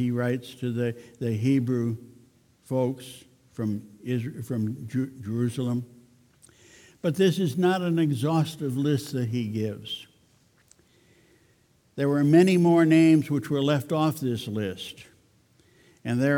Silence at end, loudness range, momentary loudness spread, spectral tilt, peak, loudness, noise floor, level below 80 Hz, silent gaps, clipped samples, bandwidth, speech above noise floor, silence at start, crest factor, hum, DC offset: 0 s; 10 LU; 16 LU; -7 dB/octave; -8 dBFS; -25 LUFS; -63 dBFS; -68 dBFS; none; under 0.1%; 18 kHz; 39 dB; 0 s; 18 dB; none; under 0.1%